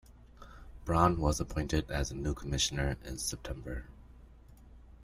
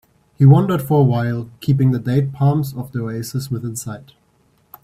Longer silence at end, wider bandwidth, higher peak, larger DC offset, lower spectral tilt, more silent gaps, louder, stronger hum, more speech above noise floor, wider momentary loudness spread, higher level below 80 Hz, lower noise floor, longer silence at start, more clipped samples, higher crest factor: second, 0 s vs 0.8 s; about the same, 15.5 kHz vs 15 kHz; second, -10 dBFS vs 0 dBFS; neither; second, -4.5 dB/octave vs -8 dB/octave; neither; second, -33 LUFS vs -18 LUFS; neither; second, 22 dB vs 42 dB; first, 21 LU vs 14 LU; first, -42 dBFS vs -52 dBFS; second, -55 dBFS vs -59 dBFS; second, 0.1 s vs 0.4 s; neither; first, 24 dB vs 18 dB